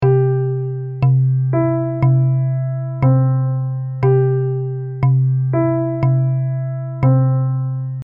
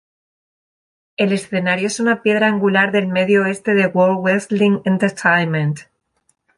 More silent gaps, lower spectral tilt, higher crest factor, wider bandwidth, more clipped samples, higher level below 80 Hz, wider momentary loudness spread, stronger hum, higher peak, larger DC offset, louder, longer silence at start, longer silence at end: neither; first, -13 dB/octave vs -5.5 dB/octave; about the same, 12 dB vs 16 dB; second, 2.8 kHz vs 11.5 kHz; neither; first, -48 dBFS vs -62 dBFS; first, 8 LU vs 5 LU; neither; about the same, -4 dBFS vs -2 dBFS; neither; about the same, -17 LUFS vs -16 LUFS; second, 0 s vs 1.2 s; second, 0 s vs 0.75 s